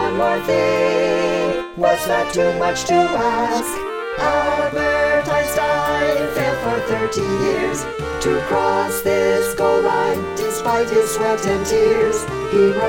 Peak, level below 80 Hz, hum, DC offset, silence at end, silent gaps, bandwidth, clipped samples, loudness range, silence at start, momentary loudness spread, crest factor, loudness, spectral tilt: -4 dBFS; -42 dBFS; none; under 0.1%; 0 s; none; 17 kHz; under 0.1%; 2 LU; 0 s; 5 LU; 14 dB; -18 LUFS; -4 dB/octave